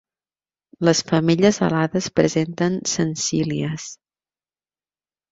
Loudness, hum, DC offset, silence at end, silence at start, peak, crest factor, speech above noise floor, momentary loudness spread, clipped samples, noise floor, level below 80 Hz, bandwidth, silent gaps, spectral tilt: -20 LUFS; none; under 0.1%; 1.35 s; 0.8 s; -2 dBFS; 20 dB; over 70 dB; 8 LU; under 0.1%; under -90 dBFS; -56 dBFS; 7.8 kHz; none; -5 dB/octave